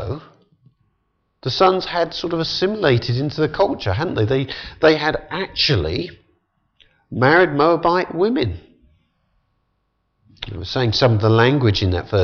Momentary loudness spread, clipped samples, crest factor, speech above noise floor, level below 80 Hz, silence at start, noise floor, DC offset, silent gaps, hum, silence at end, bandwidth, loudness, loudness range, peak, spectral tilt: 14 LU; under 0.1%; 16 dB; 52 dB; -44 dBFS; 0 s; -69 dBFS; under 0.1%; none; none; 0 s; 6.8 kHz; -18 LUFS; 3 LU; -2 dBFS; -6.5 dB/octave